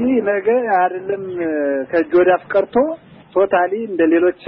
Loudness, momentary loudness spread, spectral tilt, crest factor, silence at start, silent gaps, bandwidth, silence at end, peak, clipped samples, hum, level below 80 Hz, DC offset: -17 LUFS; 8 LU; -4.5 dB/octave; 12 dB; 0 s; none; 4.3 kHz; 0 s; -4 dBFS; under 0.1%; none; -56 dBFS; under 0.1%